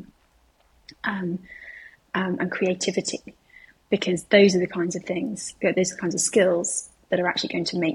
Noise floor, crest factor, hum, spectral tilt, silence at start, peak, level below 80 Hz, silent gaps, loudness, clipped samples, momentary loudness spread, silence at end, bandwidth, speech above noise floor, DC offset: -62 dBFS; 22 dB; none; -4 dB/octave; 0 s; -4 dBFS; -64 dBFS; none; -24 LUFS; under 0.1%; 12 LU; 0 s; 12.5 kHz; 38 dB; under 0.1%